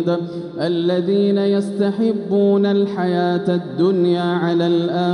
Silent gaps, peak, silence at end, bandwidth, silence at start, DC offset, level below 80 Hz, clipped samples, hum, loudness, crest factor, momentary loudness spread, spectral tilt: none; -6 dBFS; 0 s; 10.5 kHz; 0 s; under 0.1%; -68 dBFS; under 0.1%; none; -18 LUFS; 12 dB; 5 LU; -8 dB/octave